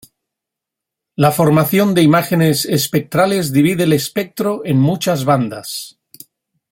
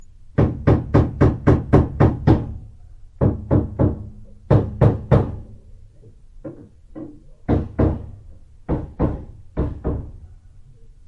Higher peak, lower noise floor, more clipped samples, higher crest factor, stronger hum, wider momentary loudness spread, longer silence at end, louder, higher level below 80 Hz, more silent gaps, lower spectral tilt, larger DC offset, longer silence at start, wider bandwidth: about the same, -2 dBFS vs 0 dBFS; first, -82 dBFS vs -45 dBFS; neither; second, 14 dB vs 20 dB; neither; second, 10 LU vs 22 LU; first, 0.85 s vs 0.15 s; first, -15 LUFS vs -20 LUFS; second, -54 dBFS vs -30 dBFS; neither; second, -5.5 dB/octave vs -10.5 dB/octave; neither; first, 1.2 s vs 0.4 s; first, 17 kHz vs 6 kHz